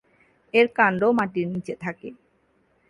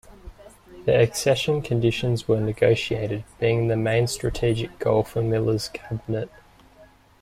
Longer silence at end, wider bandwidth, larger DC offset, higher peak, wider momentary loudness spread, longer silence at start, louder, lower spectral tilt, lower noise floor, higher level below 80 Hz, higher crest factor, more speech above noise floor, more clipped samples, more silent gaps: first, 0.75 s vs 0.35 s; second, 11 kHz vs 15 kHz; neither; about the same, -4 dBFS vs -6 dBFS; first, 16 LU vs 9 LU; first, 0.55 s vs 0.1 s; about the same, -23 LUFS vs -23 LUFS; about the same, -7 dB/octave vs -6 dB/octave; first, -65 dBFS vs -53 dBFS; second, -64 dBFS vs -46 dBFS; about the same, 20 dB vs 18 dB; first, 43 dB vs 30 dB; neither; neither